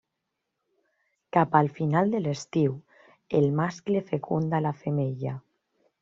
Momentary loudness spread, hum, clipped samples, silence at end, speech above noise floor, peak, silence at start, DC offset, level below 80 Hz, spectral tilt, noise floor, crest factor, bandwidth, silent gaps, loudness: 7 LU; none; under 0.1%; 0.6 s; 57 dB; -6 dBFS; 1.35 s; under 0.1%; -66 dBFS; -7.5 dB/octave; -82 dBFS; 22 dB; 7.6 kHz; none; -27 LUFS